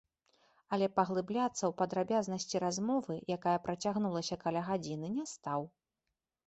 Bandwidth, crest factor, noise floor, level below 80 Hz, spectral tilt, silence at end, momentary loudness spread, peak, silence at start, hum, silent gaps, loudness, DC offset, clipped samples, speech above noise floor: 8.2 kHz; 20 dB; -89 dBFS; -72 dBFS; -5 dB/octave; 0.8 s; 6 LU; -14 dBFS; 0.7 s; none; none; -35 LUFS; under 0.1%; under 0.1%; 54 dB